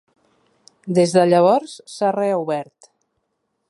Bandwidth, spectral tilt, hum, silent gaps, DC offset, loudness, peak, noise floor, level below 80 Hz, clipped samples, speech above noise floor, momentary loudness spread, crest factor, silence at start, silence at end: 11.5 kHz; -6 dB/octave; none; none; under 0.1%; -18 LUFS; -2 dBFS; -73 dBFS; -68 dBFS; under 0.1%; 55 dB; 20 LU; 18 dB; 0.85 s; 1.05 s